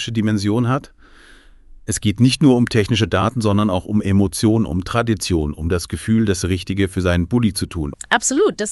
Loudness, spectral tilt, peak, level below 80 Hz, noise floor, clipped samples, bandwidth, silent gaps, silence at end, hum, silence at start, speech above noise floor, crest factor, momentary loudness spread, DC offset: -18 LUFS; -5.5 dB/octave; 0 dBFS; -40 dBFS; -45 dBFS; under 0.1%; 12 kHz; none; 0 s; none; 0 s; 28 dB; 18 dB; 7 LU; under 0.1%